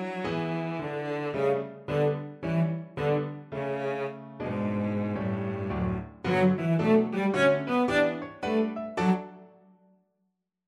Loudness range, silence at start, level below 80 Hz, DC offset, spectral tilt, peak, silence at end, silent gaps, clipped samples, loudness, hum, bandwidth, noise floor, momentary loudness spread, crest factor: 5 LU; 0 s; -54 dBFS; under 0.1%; -7.5 dB/octave; -12 dBFS; 1.2 s; none; under 0.1%; -28 LUFS; none; 11.5 kHz; -78 dBFS; 9 LU; 18 dB